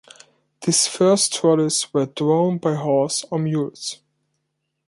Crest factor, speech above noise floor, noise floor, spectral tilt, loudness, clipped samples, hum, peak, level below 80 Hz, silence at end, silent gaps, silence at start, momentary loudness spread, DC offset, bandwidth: 16 dB; 56 dB; -75 dBFS; -4.5 dB/octave; -19 LUFS; under 0.1%; none; -4 dBFS; -68 dBFS; 0.95 s; none; 0.6 s; 11 LU; under 0.1%; 11.5 kHz